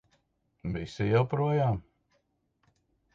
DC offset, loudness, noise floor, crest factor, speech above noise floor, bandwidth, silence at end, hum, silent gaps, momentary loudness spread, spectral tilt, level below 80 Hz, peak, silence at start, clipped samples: under 0.1%; -29 LUFS; -75 dBFS; 18 dB; 47 dB; 7.6 kHz; 1.35 s; none; none; 11 LU; -8.5 dB/octave; -54 dBFS; -14 dBFS; 0.65 s; under 0.1%